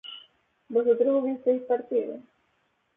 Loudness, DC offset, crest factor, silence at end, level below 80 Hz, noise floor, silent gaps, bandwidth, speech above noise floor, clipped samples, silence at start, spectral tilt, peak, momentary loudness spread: -26 LUFS; under 0.1%; 16 dB; 0.75 s; -80 dBFS; -71 dBFS; none; 3.7 kHz; 46 dB; under 0.1%; 0.05 s; -8.5 dB/octave; -12 dBFS; 20 LU